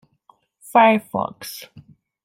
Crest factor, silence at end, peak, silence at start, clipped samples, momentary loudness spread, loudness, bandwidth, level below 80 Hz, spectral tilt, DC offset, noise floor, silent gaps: 20 dB; 0.65 s; -2 dBFS; 0.75 s; under 0.1%; 19 LU; -18 LUFS; 16.5 kHz; -64 dBFS; -5 dB/octave; under 0.1%; -58 dBFS; none